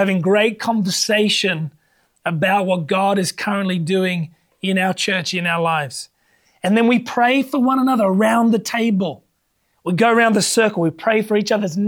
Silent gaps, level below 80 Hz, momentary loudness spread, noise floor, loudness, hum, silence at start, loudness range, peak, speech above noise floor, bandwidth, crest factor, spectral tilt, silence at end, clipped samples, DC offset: none; -68 dBFS; 10 LU; -67 dBFS; -18 LUFS; none; 0 s; 3 LU; -2 dBFS; 50 dB; 19 kHz; 14 dB; -4.5 dB/octave; 0 s; under 0.1%; under 0.1%